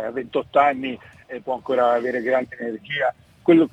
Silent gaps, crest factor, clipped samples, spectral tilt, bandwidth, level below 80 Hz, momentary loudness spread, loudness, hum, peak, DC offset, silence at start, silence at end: none; 18 dB; under 0.1%; -7 dB/octave; 7.8 kHz; -64 dBFS; 13 LU; -22 LUFS; none; -4 dBFS; under 0.1%; 0 s; 0.05 s